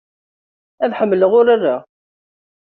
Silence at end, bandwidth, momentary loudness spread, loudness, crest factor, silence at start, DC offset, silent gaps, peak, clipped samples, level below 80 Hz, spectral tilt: 0.9 s; 4.4 kHz; 10 LU; -15 LUFS; 16 dB; 0.8 s; under 0.1%; none; -2 dBFS; under 0.1%; -64 dBFS; -4.5 dB/octave